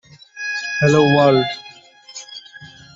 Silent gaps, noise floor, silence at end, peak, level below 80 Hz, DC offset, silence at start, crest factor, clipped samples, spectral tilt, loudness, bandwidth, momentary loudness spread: none; -43 dBFS; 0.3 s; -2 dBFS; -54 dBFS; under 0.1%; 0.35 s; 16 dB; under 0.1%; -5.5 dB/octave; -16 LUFS; 7.8 kHz; 22 LU